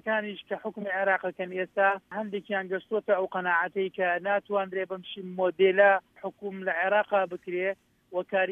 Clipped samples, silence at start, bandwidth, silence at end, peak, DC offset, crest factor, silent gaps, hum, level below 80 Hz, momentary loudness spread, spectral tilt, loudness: under 0.1%; 0.05 s; 3.8 kHz; 0 s; -10 dBFS; under 0.1%; 18 dB; none; none; -78 dBFS; 12 LU; -7 dB/octave; -28 LUFS